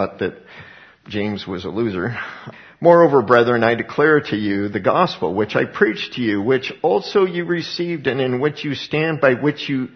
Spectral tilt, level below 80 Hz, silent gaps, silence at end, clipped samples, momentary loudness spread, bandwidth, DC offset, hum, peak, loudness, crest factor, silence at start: -7 dB/octave; -58 dBFS; none; 0.1 s; under 0.1%; 12 LU; 6.4 kHz; under 0.1%; none; 0 dBFS; -18 LUFS; 18 dB; 0 s